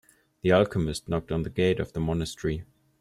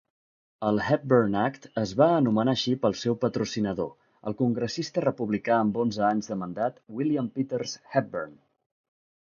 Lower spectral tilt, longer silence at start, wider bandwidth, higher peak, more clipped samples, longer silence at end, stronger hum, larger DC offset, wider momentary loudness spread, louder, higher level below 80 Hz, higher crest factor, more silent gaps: about the same, -6.5 dB/octave vs -6 dB/octave; second, 0.45 s vs 0.6 s; first, 14 kHz vs 7.2 kHz; about the same, -8 dBFS vs -6 dBFS; neither; second, 0.35 s vs 0.95 s; neither; neither; about the same, 9 LU vs 10 LU; about the same, -27 LUFS vs -27 LUFS; first, -46 dBFS vs -62 dBFS; about the same, 18 dB vs 20 dB; neither